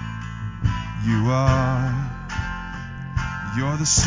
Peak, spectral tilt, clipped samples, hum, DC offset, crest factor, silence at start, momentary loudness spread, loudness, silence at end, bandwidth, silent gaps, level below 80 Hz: -4 dBFS; -4.5 dB/octave; under 0.1%; none; under 0.1%; 20 dB; 0 s; 13 LU; -24 LUFS; 0 s; 7.8 kHz; none; -34 dBFS